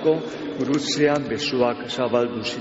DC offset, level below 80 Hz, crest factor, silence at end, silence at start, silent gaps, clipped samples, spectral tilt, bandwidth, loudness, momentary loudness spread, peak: under 0.1%; -58 dBFS; 16 dB; 0 s; 0 s; none; under 0.1%; -3.5 dB/octave; 8 kHz; -23 LUFS; 5 LU; -8 dBFS